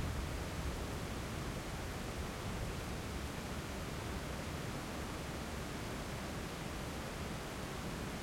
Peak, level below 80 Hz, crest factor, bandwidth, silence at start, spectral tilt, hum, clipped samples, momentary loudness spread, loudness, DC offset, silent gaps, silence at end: -28 dBFS; -48 dBFS; 14 dB; 16.5 kHz; 0 s; -4.5 dB/octave; none; under 0.1%; 1 LU; -43 LUFS; under 0.1%; none; 0 s